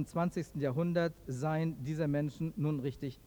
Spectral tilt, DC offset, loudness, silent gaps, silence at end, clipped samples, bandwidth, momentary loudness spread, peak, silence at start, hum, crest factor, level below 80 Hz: -8 dB/octave; under 0.1%; -35 LUFS; none; 0.05 s; under 0.1%; 20 kHz; 5 LU; -20 dBFS; 0 s; none; 16 dB; -60 dBFS